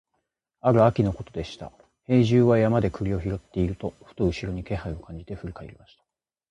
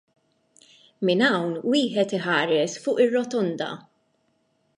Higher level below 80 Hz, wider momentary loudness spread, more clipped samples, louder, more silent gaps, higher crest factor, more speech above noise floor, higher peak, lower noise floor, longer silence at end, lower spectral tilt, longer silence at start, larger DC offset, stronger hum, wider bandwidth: first, -44 dBFS vs -76 dBFS; first, 19 LU vs 7 LU; neither; about the same, -24 LUFS vs -23 LUFS; neither; about the same, 20 dB vs 18 dB; first, 54 dB vs 46 dB; about the same, -6 dBFS vs -8 dBFS; first, -78 dBFS vs -69 dBFS; second, 0.8 s vs 1 s; first, -8.5 dB/octave vs -5 dB/octave; second, 0.65 s vs 1 s; neither; neither; second, 9 kHz vs 11 kHz